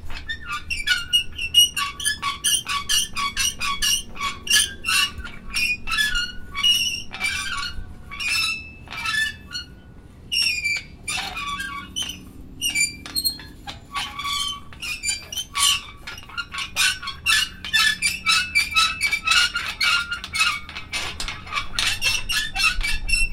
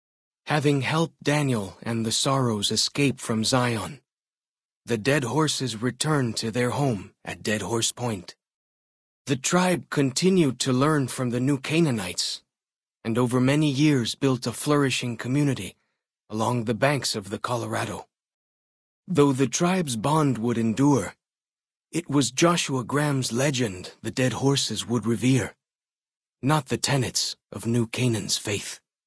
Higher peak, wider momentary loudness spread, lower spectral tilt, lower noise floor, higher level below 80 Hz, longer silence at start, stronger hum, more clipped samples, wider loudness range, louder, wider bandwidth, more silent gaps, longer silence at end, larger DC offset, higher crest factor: about the same, -4 dBFS vs -6 dBFS; first, 13 LU vs 9 LU; second, 0.5 dB/octave vs -4.5 dB/octave; second, -43 dBFS vs under -90 dBFS; first, -38 dBFS vs -60 dBFS; second, 0 s vs 0.45 s; neither; neither; first, 7 LU vs 3 LU; first, -21 LUFS vs -24 LUFS; first, 16.5 kHz vs 11 kHz; second, none vs 4.13-4.17 s, 4.49-4.55 s, 4.65-4.69 s, 4.75-4.81 s, 8.54-9.25 s, 18.34-19.03 s, 25.75-25.79 s, 26.17-26.21 s; second, 0 s vs 0.3 s; neither; about the same, 20 dB vs 18 dB